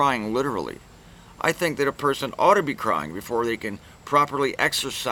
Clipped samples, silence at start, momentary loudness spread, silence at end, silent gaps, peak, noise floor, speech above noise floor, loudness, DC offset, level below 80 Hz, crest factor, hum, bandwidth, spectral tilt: under 0.1%; 0 s; 11 LU; 0 s; none; -4 dBFS; -47 dBFS; 24 dB; -23 LUFS; under 0.1%; -54 dBFS; 20 dB; none; 19.5 kHz; -4 dB/octave